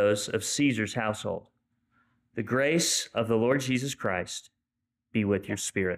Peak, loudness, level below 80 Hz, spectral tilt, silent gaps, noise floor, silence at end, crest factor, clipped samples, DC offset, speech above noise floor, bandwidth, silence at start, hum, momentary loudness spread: -14 dBFS; -28 LUFS; -66 dBFS; -4 dB/octave; none; -85 dBFS; 0 s; 14 dB; under 0.1%; under 0.1%; 57 dB; 15.5 kHz; 0 s; none; 12 LU